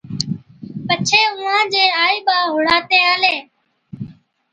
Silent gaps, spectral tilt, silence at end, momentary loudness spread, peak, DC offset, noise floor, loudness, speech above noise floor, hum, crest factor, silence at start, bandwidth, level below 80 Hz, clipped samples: none; -2.5 dB/octave; 0.4 s; 21 LU; 0 dBFS; under 0.1%; -40 dBFS; -15 LUFS; 24 dB; none; 18 dB; 0.05 s; 9.6 kHz; -58 dBFS; under 0.1%